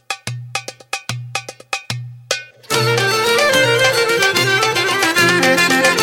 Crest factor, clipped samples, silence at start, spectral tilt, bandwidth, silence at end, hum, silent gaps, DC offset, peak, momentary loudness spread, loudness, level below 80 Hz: 16 dB; under 0.1%; 0.1 s; -3 dB/octave; 17 kHz; 0 s; none; none; under 0.1%; 0 dBFS; 14 LU; -15 LUFS; -56 dBFS